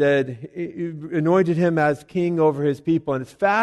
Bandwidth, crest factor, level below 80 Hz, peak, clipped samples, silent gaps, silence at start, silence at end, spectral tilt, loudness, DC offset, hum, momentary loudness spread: 12 kHz; 14 dB; -60 dBFS; -6 dBFS; under 0.1%; none; 0 s; 0 s; -8 dB/octave; -22 LUFS; under 0.1%; none; 11 LU